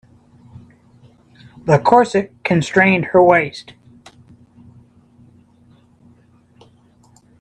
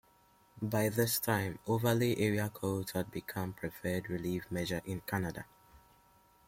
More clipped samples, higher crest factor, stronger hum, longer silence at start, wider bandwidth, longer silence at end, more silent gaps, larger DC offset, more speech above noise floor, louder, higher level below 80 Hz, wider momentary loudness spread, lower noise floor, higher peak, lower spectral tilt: neither; about the same, 20 dB vs 20 dB; neither; first, 1.65 s vs 0.55 s; second, 10.5 kHz vs 16.5 kHz; first, 3.8 s vs 0.7 s; neither; neither; first, 38 dB vs 32 dB; first, -14 LUFS vs -35 LUFS; first, -56 dBFS vs -64 dBFS; first, 13 LU vs 10 LU; second, -52 dBFS vs -66 dBFS; first, 0 dBFS vs -16 dBFS; about the same, -6.5 dB/octave vs -5.5 dB/octave